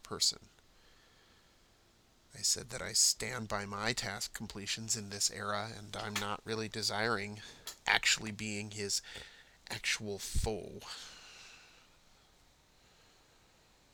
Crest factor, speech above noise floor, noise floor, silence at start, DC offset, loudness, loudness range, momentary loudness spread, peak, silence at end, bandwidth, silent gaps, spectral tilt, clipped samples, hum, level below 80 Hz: 30 dB; 30 dB; -67 dBFS; 0.05 s; under 0.1%; -35 LUFS; 8 LU; 20 LU; -8 dBFS; 2.2 s; over 20 kHz; none; -1.5 dB/octave; under 0.1%; none; -52 dBFS